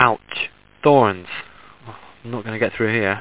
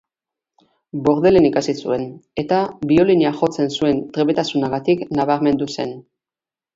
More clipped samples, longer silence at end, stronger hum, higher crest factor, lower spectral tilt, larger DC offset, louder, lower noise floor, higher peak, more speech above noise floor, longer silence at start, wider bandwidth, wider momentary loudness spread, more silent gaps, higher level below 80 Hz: neither; second, 0 s vs 0.75 s; neither; about the same, 20 dB vs 16 dB; first, -9.5 dB/octave vs -6.5 dB/octave; first, 0.4% vs under 0.1%; about the same, -20 LUFS vs -18 LUFS; second, -41 dBFS vs under -90 dBFS; about the same, 0 dBFS vs -2 dBFS; second, 23 dB vs over 73 dB; second, 0 s vs 0.95 s; second, 4 kHz vs 7.8 kHz; first, 26 LU vs 12 LU; neither; about the same, -54 dBFS vs -52 dBFS